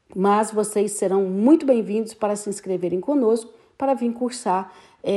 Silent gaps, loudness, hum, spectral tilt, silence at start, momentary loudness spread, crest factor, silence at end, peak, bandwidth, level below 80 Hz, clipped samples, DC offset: none; -22 LUFS; none; -5.5 dB/octave; 0.15 s; 9 LU; 16 dB; 0 s; -4 dBFS; 12.5 kHz; -68 dBFS; under 0.1%; under 0.1%